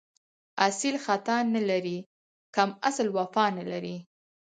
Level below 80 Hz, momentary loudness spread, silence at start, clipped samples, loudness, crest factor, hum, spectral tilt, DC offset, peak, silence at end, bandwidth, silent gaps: -78 dBFS; 11 LU; 0.55 s; under 0.1%; -28 LUFS; 24 dB; none; -4 dB/octave; under 0.1%; -6 dBFS; 0.45 s; 9.6 kHz; 2.06-2.53 s